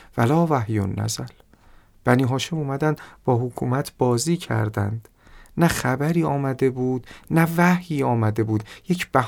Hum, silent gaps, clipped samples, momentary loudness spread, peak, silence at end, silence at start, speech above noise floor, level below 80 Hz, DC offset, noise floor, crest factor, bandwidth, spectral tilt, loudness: none; none; under 0.1%; 8 LU; -2 dBFS; 0 s; 0.15 s; 30 dB; -50 dBFS; under 0.1%; -51 dBFS; 20 dB; 18 kHz; -6 dB/octave; -22 LUFS